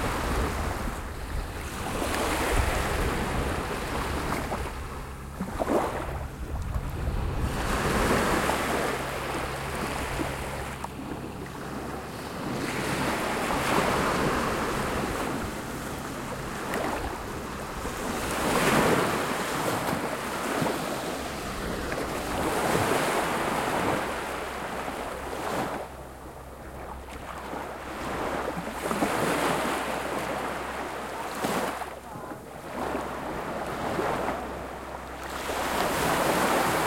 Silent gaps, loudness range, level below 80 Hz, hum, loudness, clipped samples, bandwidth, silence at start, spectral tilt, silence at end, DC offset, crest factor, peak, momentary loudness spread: none; 6 LU; -40 dBFS; none; -29 LUFS; under 0.1%; 16.5 kHz; 0 s; -4.5 dB/octave; 0 s; under 0.1%; 20 dB; -10 dBFS; 12 LU